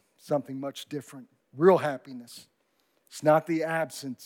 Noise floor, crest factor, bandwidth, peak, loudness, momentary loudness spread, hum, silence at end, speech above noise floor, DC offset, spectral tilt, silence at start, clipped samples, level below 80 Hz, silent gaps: -72 dBFS; 20 dB; 17 kHz; -8 dBFS; -27 LUFS; 23 LU; none; 0 s; 44 dB; under 0.1%; -6 dB/octave; 0.25 s; under 0.1%; under -90 dBFS; none